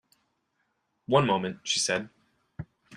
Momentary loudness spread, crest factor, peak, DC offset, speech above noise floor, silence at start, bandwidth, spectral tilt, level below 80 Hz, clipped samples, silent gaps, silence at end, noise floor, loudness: 22 LU; 24 dB; -6 dBFS; under 0.1%; 50 dB; 1.1 s; 13.5 kHz; -3.5 dB/octave; -64 dBFS; under 0.1%; none; 0 s; -76 dBFS; -27 LUFS